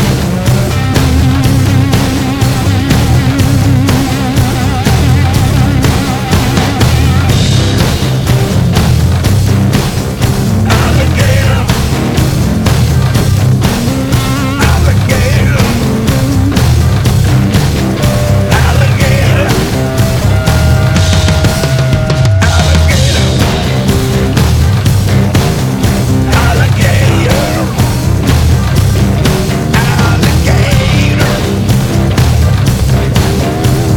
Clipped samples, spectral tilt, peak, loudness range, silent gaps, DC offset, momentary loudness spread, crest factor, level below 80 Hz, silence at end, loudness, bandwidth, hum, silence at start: under 0.1%; -5.5 dB/octave; 0 dBFS; 1 LU; none; under 0.1%; 3 LU; 8 dB; -18 dBFS; 0 s; -10 LUFS; 19 kHz; none; 0 s